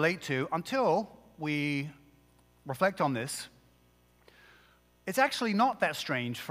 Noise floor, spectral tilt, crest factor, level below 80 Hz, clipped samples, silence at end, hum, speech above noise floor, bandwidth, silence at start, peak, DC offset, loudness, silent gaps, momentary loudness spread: -65 dBFS; -4.5 dB/octave; 20 dB; -70 dBFS; under 0.1%; 0 s; 60 Hz at -60 dBFS; 34 dB; 16 kHz; 0 s; -12 dBFS; under 0.1%; -31 LUFS; none; 15 LU